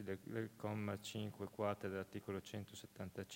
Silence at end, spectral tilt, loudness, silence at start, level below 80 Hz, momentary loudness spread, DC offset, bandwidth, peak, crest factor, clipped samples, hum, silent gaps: 0 s; -6 dB/octave; -47 LUFS; 0 s; -78 dBFS; 8 LU; under 0.1%; 16 kHz; -26 dBFS; 20 dB; under 0.1%; none; none